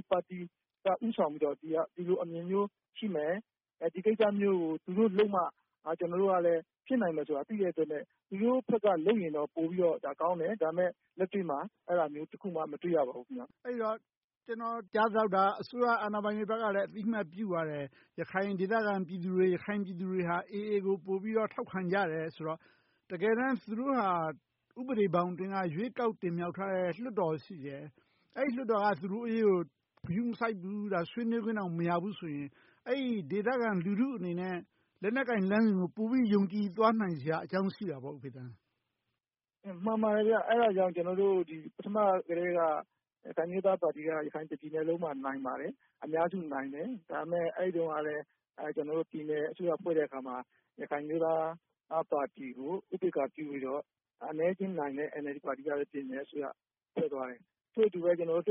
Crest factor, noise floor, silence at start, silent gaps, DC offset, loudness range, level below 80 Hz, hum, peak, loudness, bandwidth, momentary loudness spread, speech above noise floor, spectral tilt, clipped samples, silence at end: 20 dB; under -90 dBFS; 0.1 s; 14.17-14.28 s, 14.37-14.41 s; under 0.1%; 5 LU; -78 dBFS; none; -14 dBFS; -33 LUFS; 5.6 kHz; 13 LU; over 57 dB; -6 dB/octave; under 0.1%; 0 s